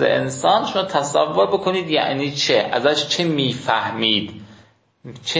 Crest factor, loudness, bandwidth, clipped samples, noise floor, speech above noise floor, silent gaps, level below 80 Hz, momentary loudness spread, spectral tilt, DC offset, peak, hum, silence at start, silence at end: 18 dB; -19 LUFS; 8 kHz; under 0.1%; -52 dBFS; 33 dB; none; -58 dBFS; 3 LU; -4 dB/octave; under 0.1%; -2 dBFS; none; 0 s; 0 s